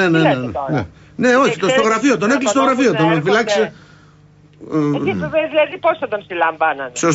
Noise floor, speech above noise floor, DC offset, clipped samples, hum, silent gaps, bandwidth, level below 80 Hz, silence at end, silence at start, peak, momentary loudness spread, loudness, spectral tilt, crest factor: -47 dBFS; 31 dB; under 0.1%; under 0.1%; 50 Hz at -45 dBFS; none; 8 kHz; -52 dBFS; 0 s; 0 s; -4 dBFS; 8 LU; -16 LUFS; -5 dB/octave; 12 dB